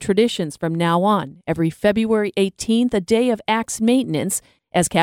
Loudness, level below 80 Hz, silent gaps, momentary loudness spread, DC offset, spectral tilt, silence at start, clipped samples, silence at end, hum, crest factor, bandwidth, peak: -20 LUFS; -52 dBFS; none; 6 LU; under 0.1%; -5 dB/octave; 0 s; under 0.1%; 0 s; none; 16 dB; 16.5 kHz; -2 dBFS